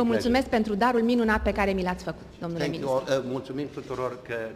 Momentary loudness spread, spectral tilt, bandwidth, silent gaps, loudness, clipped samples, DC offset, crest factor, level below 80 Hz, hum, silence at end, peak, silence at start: 11 LU; -6 dB/octave; 15.5 kHz; none; -27 LUFS; under 0.1%; under 0.1%; 16 dB; -44 dBFS; none; 0 s; -10 dBFS; 0 s